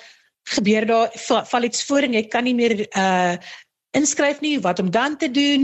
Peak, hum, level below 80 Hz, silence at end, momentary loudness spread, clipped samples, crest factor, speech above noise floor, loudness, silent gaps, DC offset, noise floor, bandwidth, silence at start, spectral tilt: -6 dBFS; none; -62 dBFS; 0 s; 5 LU; under 0.1%; 14 dB; 23 dB; -20 LUFS; none; under 0.1%; -42 dBFS; 8.6 kHz; 0.45 s; -3.5 dB/octave